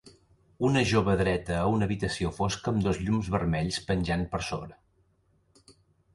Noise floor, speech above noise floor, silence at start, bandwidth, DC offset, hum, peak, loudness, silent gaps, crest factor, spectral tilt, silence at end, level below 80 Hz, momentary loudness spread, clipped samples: -68 dBFS; 41 dB; 0.05 s; 11.5 kHz; under 0.1%; none; -10 dBFS; -28 LUFS; none; 20 dB; -6 dB/octave; 0.45 s; -44 dBFS; 7 LU; under 0.1%